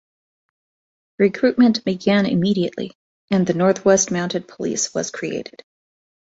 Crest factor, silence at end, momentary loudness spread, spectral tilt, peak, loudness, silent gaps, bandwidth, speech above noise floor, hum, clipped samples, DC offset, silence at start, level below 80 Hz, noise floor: 18 dB; 0.9 s; 12 LU; -4.5 dB/octave; -2 dBFS; -19 LUFS; 2.95-3.28 s; 8 kHz; over 71 dB; none; under 0.1%; under 0.1%; 1.2 s; -60 dBFS; under -90 dBFS